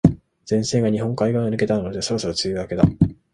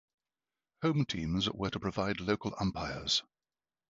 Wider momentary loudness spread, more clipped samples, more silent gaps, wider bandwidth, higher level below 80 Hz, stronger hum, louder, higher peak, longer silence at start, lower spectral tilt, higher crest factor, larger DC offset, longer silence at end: about the same, 5 LU vs 4 LU; neither; neither; first, 11 kHz vs 8 kHz; first, -40 dBFS vs -54 dBFS; neither; first, -21 LUFS vs -34 LUFS; first, 0 dBFS vs -14 dBFS; second, 0.05 s vs 0.8 s; about the same, -6 dB/octave vs -5 dB/octave; about the same, 20 dB vs 20 dB; neither; second, 0.2 s vs 0.7 s